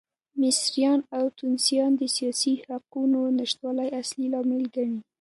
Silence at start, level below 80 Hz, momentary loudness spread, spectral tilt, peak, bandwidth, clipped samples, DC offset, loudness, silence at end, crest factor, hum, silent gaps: 0.35 s; -80 dBFS; 7 LU; -2.5 dB/octave; -10 dBFS; 11.5 kHz; under 0.1%; under 0.1%; -25 LUFS; 0.2 s; 16 dB; none; none